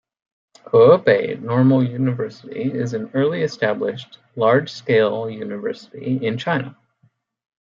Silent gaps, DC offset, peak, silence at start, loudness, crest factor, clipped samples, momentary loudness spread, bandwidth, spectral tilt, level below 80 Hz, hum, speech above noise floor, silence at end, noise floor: none; under 0.1%; -2 dBFS; 0.75 s; -19 LUFS; 18 dB; under 0.1%; 14 LU; 7.4 kHz; -7.5 dB/octave; -66 dBFS; none; 43 dB; 1 s; -62 dBFS